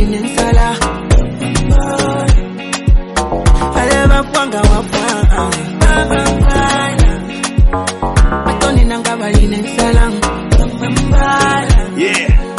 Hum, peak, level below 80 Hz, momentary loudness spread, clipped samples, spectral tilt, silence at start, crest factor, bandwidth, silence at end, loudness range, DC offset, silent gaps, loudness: none; 0 dBFS; -14 dBFS; 4 LU; under 0.1%; -5 dB/octave; 0 s; 10 dB; 11.5 kHz; 0 s; 1 LU; under 0.1%; none; -13 LUFS